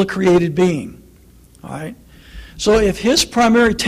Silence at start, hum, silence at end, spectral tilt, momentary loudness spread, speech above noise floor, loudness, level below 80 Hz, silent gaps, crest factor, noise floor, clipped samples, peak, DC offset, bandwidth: 0 s; none; 0 s; -4.5 dB/octave; 18 LU; 31 dB; -15 LUFS; -36 dBFS; none; 12 dB; -46 dBFS; under 0.1%; -4 dBFS; under 0.1%; 15.5 kHz